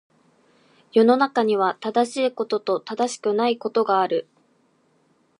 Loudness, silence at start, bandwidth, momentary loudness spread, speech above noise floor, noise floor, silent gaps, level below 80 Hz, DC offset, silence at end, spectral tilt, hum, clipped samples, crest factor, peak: -22 LUFS; 0.95 s; 11 kHz; 8 LU; 42 dB; -63 dBFS; none; -80 dBFS; under 0.1%; 1.2 s; -4.5 dB/octave; none; under 0.1%; 18 dB; -4 dBFS